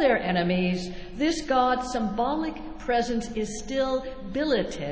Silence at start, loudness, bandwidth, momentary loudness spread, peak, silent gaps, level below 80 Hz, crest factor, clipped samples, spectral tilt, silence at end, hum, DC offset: 0 s; -27 LUFS; 8 kHz; 9 LU; -10 dBFS; none; -46 dBFS; 16 dB; under 0.1%; -5 dB/octave; 0 s; none; under 0.1%